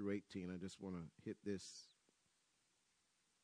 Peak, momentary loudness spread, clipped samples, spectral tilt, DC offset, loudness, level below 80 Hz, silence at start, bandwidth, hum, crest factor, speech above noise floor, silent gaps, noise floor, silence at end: -32 dBFS; 10 LU; under 0.1%; -5.5 dB/octave; under 0.1%; -50 LUFS; -82 dBFS; 0 s; 10.5 kHz; none; 20 dB; 33 dB; none; -82 dBFS; 1.55 s